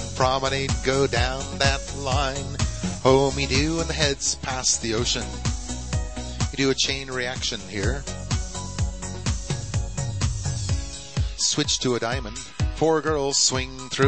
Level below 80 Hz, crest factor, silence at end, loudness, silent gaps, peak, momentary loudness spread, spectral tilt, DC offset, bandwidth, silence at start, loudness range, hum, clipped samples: -34 dBFS; 20 dB; 0 s; -24 LUFS; none; -4 dBFS; 9 LU; -3.5 dB/octave; 0.6%; 8.8 kHz; 0 s; 5 LU; none; under 0.1%